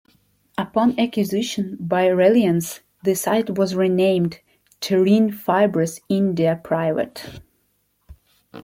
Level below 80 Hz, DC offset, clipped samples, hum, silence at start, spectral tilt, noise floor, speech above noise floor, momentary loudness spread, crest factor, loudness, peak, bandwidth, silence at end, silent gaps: -58 dBFS; under 0.1%; under 0.1%; none; 0.6 s; -6 dB/octave; -67 dBFS; 48 dB; 11 LU; 16 dB; -20 LUFS; -4 dBFS; 16.5 kHz; 0 s; none